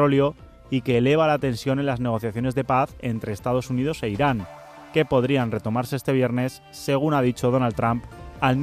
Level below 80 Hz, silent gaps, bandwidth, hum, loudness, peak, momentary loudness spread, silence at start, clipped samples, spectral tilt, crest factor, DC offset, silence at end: -48 dBFS; none; 15 kHz; none; -23 LUFS; -6 dBFS; 9 LU; 0 s; under 0.1%; -7 dB/octave; 16 dB; under 0.1%; 0 s